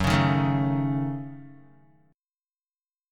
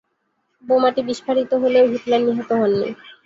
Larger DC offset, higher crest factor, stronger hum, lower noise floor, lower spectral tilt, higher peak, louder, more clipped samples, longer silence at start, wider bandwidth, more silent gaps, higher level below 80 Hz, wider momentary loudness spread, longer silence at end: neither; about the same, 18 dB vs 14 dB; neither; first, under -90 dBFS vs -70 dBFS; about the same, -7 dB/octave vs -6 dB/octave; about the same, -8 dBFS vs -6 dBFS; second, -25 LUFS vs -19 LUFS; neither; second, 0 s vs 0.65 s; first, 12.5 kHz vs 7.8 kHz; neither; first, -48 dBFS vs -62 dBFS; first, 18 LU vs 6 LU; first, 1.55 s vs 0.15 s